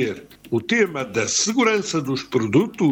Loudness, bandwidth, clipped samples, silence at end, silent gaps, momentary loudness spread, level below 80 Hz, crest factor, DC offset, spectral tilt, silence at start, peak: -21 LUFS; 19 kHz; under 0.1%; 0 s; none; 8 LU; -60 dBFS; 16 dB; under 0.1%; -4 dB/octave; 0 s; -4 dBFS